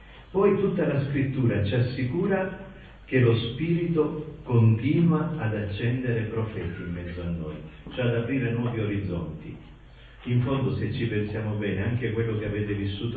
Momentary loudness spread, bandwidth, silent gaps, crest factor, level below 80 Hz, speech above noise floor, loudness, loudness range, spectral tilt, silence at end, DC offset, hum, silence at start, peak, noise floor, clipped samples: 12 LU; 4.8 kHz; none; 16 dB; -46 dBFS; 22 dB; -26 LUFS; 5 LU; -10.5 dB/octave; 0 s; under 0.1%; none; 0 s; -10 dBFS; -48 dBFS; under 0.1%